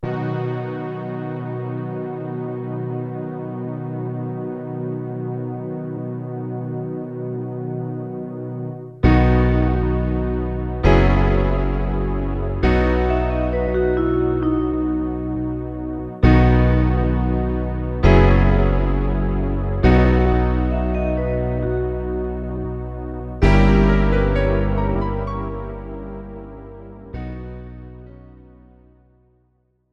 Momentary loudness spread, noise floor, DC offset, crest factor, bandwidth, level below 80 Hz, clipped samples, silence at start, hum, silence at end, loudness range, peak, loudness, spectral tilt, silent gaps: 15 LU; -64 dBFS; under 0.1%; 18 dB; 6.2 kHz; -24 dBFS; under 0.1%; 0 s; none; 1.7 s; 10 LU; 0 dBFS; -21 LUFS; -9 dB/octave; none